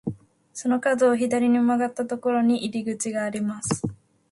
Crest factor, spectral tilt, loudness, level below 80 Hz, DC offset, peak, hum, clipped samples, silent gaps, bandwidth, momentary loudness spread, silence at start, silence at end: 14 dB; -5 dB/octave; -24 LUFS; -60 dBFS; under 0.1%; -10 dBFS; none; under 0.1%; none; 11.5 kHz; 9 LU; 0.05 s; 0.35 s